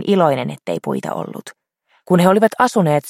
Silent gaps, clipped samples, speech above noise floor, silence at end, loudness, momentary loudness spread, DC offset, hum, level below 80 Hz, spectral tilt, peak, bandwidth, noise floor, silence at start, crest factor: none; under 0.1%; 46 dB; 0 s; -17 LUFS; 13 LU; under 0.1%; none; -62 dBFS; -6.5 dB/octave; 0 dBFS; 15.5 kHz; -62 dBFS; 0 s; 16 dB